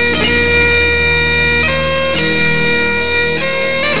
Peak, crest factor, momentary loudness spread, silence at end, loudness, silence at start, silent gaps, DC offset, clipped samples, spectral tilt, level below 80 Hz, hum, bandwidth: -2 dBFS; 12 dB; 4 LU; 0 s; -11 LUFS; 0 s; none; 5%; under 0.1%; -8 dB/octave; -28 dBFS; none; 4 kHz